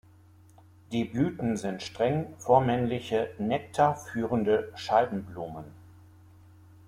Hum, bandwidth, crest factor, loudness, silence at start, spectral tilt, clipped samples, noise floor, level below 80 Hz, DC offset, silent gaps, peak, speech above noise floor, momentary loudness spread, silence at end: none; 15 kHz; 22 dB; -28 LUFS; 0.9 s; -6.5 dB/octave; under 0.1%; -56 dBFS; -60 dBFS; under 0.1%; none; -8 dBFS; 28 dB; 12 LU; 1 s